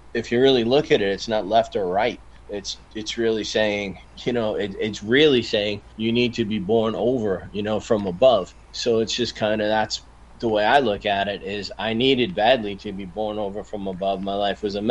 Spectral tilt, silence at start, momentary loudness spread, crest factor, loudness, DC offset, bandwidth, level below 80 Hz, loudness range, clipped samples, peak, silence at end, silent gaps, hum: -5 dB/octave; 0.05 s; 13 LU; 18 dB; -22 LUFS; under 0.1%; 9.8 kHz; -48 dBFS; 2 LU; under 0.1%; -4 dBFS; 0 s; none; none